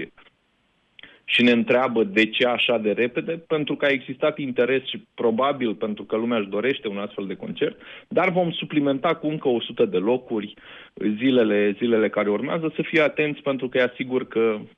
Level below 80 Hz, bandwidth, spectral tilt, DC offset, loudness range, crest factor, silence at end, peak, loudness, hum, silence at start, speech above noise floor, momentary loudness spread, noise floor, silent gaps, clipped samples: -68 dBFS; 8.2 kHz; -7 dB/octave; under 0.1%; 4 LU; 16 dB; 0.1 s; -6 dBFS; -23 LUFS; none; 0 s; 44 dB; 10 LU; -66 dBFS; none; under 0.1%